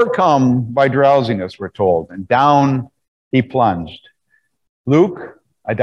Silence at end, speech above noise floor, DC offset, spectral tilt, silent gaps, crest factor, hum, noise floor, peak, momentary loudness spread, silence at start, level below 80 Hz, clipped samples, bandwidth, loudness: 0 s; 48 dB; under 0.1%; -7.5 dB/octave; 3.08-3.31 s, 4.69-4.84 s; 14 dB; none; -63 dBFS; -2 dBFS; 18 LU; 0 s; -52 dBFS; under 0.1%; 7.4 kHz; -15 LUFS